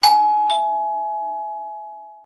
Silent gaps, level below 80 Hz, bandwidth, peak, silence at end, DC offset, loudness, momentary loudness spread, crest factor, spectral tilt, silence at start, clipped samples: none; -70 dBFS; 12.5 kHz; -2 dBFS; 0.05 s; under 0.1%; -20 LUFS; 18 LU; 18 dB; 1 dB/octave; 0 s; under 0.1%